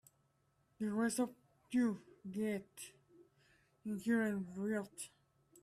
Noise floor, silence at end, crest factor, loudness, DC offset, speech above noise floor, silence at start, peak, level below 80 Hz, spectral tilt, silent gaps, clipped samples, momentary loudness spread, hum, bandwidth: -77 dBFS; 0.55 s; 16 dB; -40 LUFS; under 0.1%; 39 dB; 0.8 s; -24 dBFS; -80 dBFS; -5.5 dB/octave; none; under 0.1%; 15 LU; none; 14.5 kHz